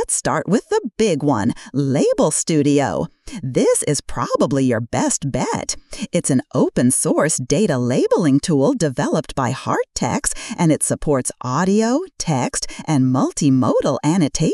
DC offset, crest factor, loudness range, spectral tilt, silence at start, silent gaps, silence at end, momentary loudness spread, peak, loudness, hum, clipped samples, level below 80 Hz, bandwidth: under 0.1%; 16 dB; 2 LU; -5 dB/octave; 0 s; none; 0 s; 6 LU; -2 dBFS; -18 LUFS; none; under 0.1%; -42 dBFS; 13.5 kHz